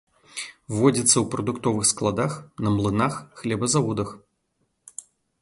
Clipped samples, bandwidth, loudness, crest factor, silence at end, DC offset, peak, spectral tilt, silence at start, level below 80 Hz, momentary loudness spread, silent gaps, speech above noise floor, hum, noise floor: under 0.1%; 11.5 kHz; -23 LUFS; 22 dB; 0.4 s; under 0.1%; -4 dBFS; -4.5 dB/octave; 0.35 s; -52 dBFS; 18 LU; none; 50 dB; none; -73 dBFS